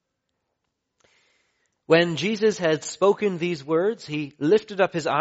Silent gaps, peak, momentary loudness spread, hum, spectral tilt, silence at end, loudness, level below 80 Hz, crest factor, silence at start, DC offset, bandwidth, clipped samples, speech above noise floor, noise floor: none; -4 dBFS; 7 LU; none; -4 dB/octave; 0 s; -23 LUFS; -68 dBFS; 20 dB; 1.9 s; under 0.1%; 8 kHz; under 0.1%; 56 dB; -78 dBFS